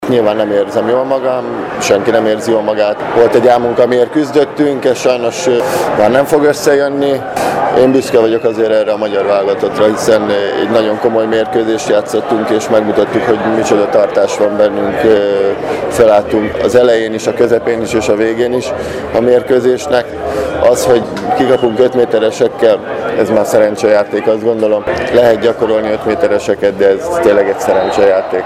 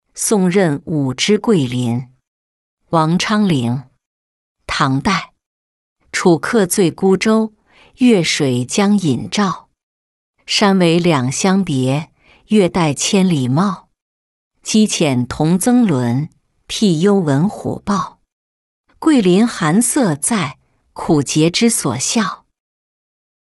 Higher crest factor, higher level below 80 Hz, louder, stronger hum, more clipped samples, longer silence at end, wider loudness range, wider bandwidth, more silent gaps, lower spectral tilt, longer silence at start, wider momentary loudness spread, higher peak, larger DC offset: about the same, 10 dB vs 14 dB; first, -42 dBFS vs -48 dBFS; first, -11 LUFS vs -15 LUFS; neither; first, 0.2% vs under 0.1%; second, 0 s vs 1.15 s; about the same, 1 LU vs 3 LU; first, 15.5 kHz vs 12.5 kHz; second, none vs 2.27-2.77 s, 4.06-4.55 s, 5.46-5.96 s, 9.83-10.34 s, 14.02-14.51 s, 18.32-18.84 s; about the same, -5 dB/octave vs -5 dB/octave; second, 0 s vs 0.15 s; second, 5 LU vs 9 LU; about the same, 0 dBFS vs -2 dBFS; neither